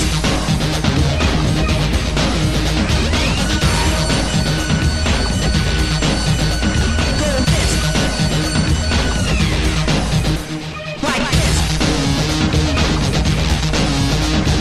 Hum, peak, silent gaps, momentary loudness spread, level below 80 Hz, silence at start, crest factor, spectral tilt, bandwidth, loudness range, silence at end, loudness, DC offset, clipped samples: none; -2 dBFS; none; 2 LU; -20 dBFS; 0 s; 14 dB; -4.5 dB/octave; 13.5 kHz; 1 LU; 0 s; -16 LUFS; under 0.1%; under 0.1%